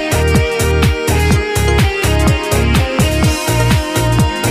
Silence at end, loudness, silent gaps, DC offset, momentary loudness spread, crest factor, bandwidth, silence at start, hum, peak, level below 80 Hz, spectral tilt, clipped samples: 0 s; -13 LUFS; none; under 0.1%; 1 LU; 12 dB; 15.5 kHz; 0 s; none; 0 dBFS; -18 dBFS; -5 dB/octave; under 0.1%